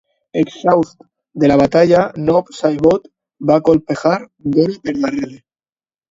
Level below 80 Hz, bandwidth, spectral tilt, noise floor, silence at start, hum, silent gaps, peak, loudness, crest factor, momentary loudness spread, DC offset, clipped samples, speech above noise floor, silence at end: -48 dBFS; 7.8 kHz; -7.5 dB/octave; under -90 dBFS; 0.35 s; none; none; 0 dBFS; -15 LUFS; 16 dB; 11 LU; under 0.1%; under 0.1%; over 76 dB; 0.75 s